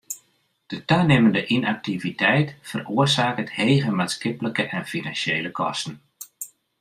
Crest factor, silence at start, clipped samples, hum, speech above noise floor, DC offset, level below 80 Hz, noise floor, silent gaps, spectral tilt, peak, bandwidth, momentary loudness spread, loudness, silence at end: 18 dB; 0.1 s; under 0.1%; none; 43 dB; under 0.1%; -60 dBFS; -65 dBFS; none; -5 dB/octave; -4 dBFS; 15.5 kHz; 18 LU; -22 LUFS; 0.35 s